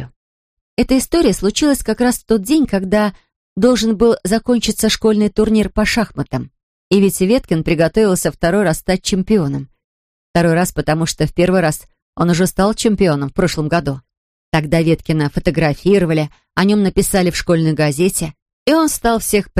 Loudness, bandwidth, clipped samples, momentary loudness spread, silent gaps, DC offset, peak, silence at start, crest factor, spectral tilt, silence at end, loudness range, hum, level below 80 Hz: -15 LUFS; 15.5 kHz; under 0.1%; 7 LU; 0.16-0.77 s, 3.36-3.56 s, 6.63-6.91 s, 9.84-10.34 s, 12.02-12.13 s, 14.17-14.52 s, 18.42-18.46 s, 18.53-18.66 s; under 0.1%; -2 dBFS; 0 s; 14 dB; -5.5 dB/octave; 0 s; 2 LU; none; -34 dBFS